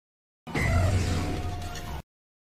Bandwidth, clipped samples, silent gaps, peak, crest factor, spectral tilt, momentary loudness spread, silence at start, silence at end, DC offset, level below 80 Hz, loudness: 15 kHz; under 0.1%; none; -12 dBFS; 16 dB; -5.5 dB/octave; 15 LU; 0.45 s; 0.45 s; under 0.1%; -36 dBFS; -29 LUFS